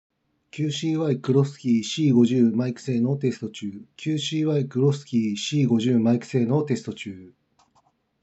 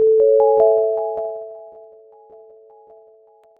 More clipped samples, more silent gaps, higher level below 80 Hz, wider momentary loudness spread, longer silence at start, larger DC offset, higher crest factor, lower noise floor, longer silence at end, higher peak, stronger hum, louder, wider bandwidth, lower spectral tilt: neither; neither; second, -78 dBFS vs -64 dBFS; second, 13 LU vs 21 LU; first, 0.55 s vs 0 s; neither; about the same, 16 dB vs 16 dB; first, -65 dBFS vs -51 dBFS; second, 0.95 s vs 1.9 s; about the same, -6 dBFS vs -4 dBFS; neither; second, -23 LUFS vs -16 LUFS; first, 8.2 kHz vs 1.7 kHz; second, -6.5 dB/octave vs -9.5 dB/octave